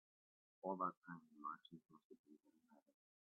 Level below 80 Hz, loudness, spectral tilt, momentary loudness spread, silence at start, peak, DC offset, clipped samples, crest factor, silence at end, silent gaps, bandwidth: under -90 dBFS; -50 LUFS; -3 dB/octave; 23 LU; 0.65 s; -30 dBFS; under 0.1%; under 0.1%; 24 dB; 0.6 s; 0.97-1.02 s, 2.05-2.10 s, 2.19-2.24 s; 3.9 kHz